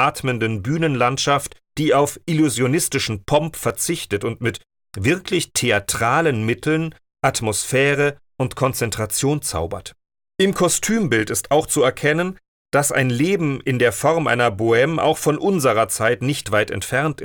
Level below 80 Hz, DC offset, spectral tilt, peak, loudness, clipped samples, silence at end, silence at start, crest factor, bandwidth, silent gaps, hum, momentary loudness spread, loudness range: -50 dBFS; under 0.1%; -4.5 dB/octave; -4 dBFS; -19 LUFS; under 0.1%; 0 s; 0 s; 16 dB; 19.5 kHz; 12.48-12.65 s; none; 7 LU; 3 LU